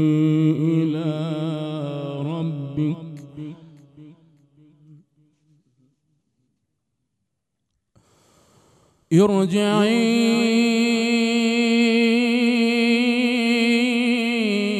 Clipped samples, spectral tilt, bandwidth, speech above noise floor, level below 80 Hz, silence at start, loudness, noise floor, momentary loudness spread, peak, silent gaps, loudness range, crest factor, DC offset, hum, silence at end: under 0.1%; -5.5 dB/octave; 13 kHz; 61 dB; -68 dBFS; 0 s; -20 LUFS; -78 dBFS; 10 LU; -4 dBFS; none; 13 LU; 18 dB; under 0.1%; none; 0 s